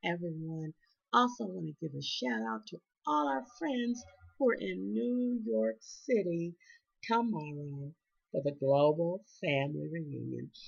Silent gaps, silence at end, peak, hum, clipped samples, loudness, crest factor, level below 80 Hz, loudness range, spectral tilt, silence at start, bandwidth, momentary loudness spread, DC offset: none; 0 s; -14 dBFS; none; under 0.1%; -34 LUFS; 20 dB; -76 dBFS; 2 LU; -6 dB/octave; 0.05 s; 7.2 kHz; 13 LU; under 0.1%